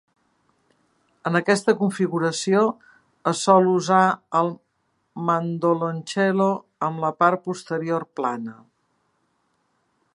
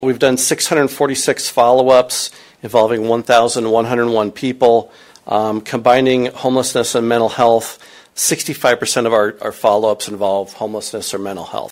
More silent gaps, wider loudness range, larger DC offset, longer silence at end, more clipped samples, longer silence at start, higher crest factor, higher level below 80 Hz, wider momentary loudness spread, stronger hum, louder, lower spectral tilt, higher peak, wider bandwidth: neither; about the same, 5 LU vs 3 LU; neither; first, 1.6 s vs 0.05 s; neither; first, 1.25 s vs 0 s; first, 22 dB vs 16 dB; second, -72 dBFS vs -56 dBFS; about the same, 11 LU vs 10 LU; neither; second, -22 LUFS vs -15 LUFS; first, -5.5 dB/octave vs -3.5 dB/octave; about the same, -2 dBFS vs 0 dBFS; second, 11.5 kHz vs 16.5 kHz